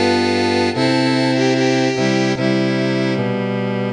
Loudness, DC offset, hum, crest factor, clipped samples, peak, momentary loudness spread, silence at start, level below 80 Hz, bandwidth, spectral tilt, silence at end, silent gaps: -17 LUFS; under 0.1%; none; 14 dB; under 0.1%; -4 dBFS; 4 LU; 0 s; -50 dBFS; 10.5 kHz; -5.5 dB/octave; 0 s; none